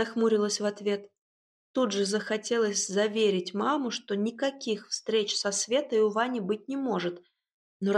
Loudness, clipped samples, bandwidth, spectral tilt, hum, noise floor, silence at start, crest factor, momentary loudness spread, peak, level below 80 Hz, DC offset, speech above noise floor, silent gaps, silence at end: -29 LUFS; under 0.1%; 11.5 kHz; -3.5 dB/octave; none; under -90 dBFS; 0 s; 16 dB; 7 LU; -12 dBFS; -82 dBFS; under 0.1%; over 62 dB; 1.21-1.74 s, 7.54-7.80 s; 0 s